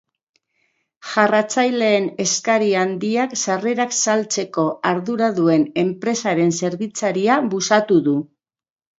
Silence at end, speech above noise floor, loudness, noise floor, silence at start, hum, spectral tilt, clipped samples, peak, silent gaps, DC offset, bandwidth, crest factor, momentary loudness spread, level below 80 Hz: 0.75 s; 50 dB; -19 LUFS; -68 dBFS; 1.05 s; none; -4 dB/octave; under 0.1%; 0 dBFS; none; under 0.1%; 8 kHz; 18 dB; 6 LU; -68 dBFS